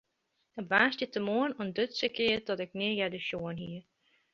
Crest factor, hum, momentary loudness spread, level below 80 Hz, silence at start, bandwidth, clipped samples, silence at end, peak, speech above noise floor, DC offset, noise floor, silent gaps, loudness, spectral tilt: 24 dB; none; 16 LU; -68 dBFS; 0.55 s; 7.4 kHz; under 0.1%; 0.5 s; -10 dBFS; 47 dB; under 0.1%; -79 dBFS; none; -31 LUFS; -5.5 dB/octave